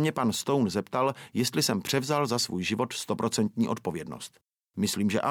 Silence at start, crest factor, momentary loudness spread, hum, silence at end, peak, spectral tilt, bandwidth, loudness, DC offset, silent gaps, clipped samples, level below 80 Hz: 0 s; 18 dB; 9 LU; none; 0 s; -10 dBFS; -4.5 dB/octave; 18 kHz; -28 LUFS; under 0.1%; none; under 0.1%; -66 dBFS